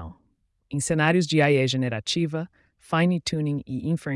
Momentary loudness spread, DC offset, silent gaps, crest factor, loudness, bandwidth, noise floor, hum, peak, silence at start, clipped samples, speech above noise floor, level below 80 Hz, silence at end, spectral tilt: 12 LU; under 0.1%; none; 16 dB; -24 LUFS; 12 kHz; -68 dBFS; none; -10 dBFS; 0 s; under 0.1%; 45 dB; -58 dBFS; 0 s; -5.5 dB/octave